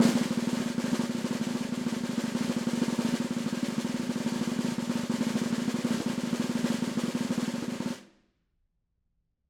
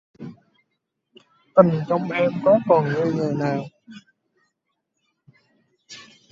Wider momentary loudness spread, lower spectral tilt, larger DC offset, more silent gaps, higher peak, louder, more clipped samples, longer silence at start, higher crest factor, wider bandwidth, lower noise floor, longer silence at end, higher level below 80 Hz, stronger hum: second, 3 LU vs 25 LU; second, -5 dB/octave vs -8 dB/octave; neither; neither; second, -10 dBFS vs 0 dBFS; second, -31 LUFS vs -20 LUFS; neither; second, 0 s vs 0.2 s; about the same, 20 dB vs 24 dB; first, 16.5 kHz vs 7.6 kHz; about the same, -77 dBFS vs -77 dBFS; first, 1.45 s vs 0.3 s; about the same, -66 dBFS vs -66 dBFS; neither